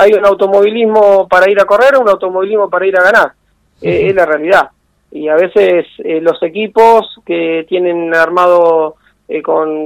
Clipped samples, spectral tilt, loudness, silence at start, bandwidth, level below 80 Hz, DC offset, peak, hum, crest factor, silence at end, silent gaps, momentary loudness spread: 2%; -5.5 dB/octave; -10 LUFS; 0 s; 16 kHz; -48 dBFS; under 0.1%; 0 dBFS; none; 10 dB; 0 s; none; 9 LU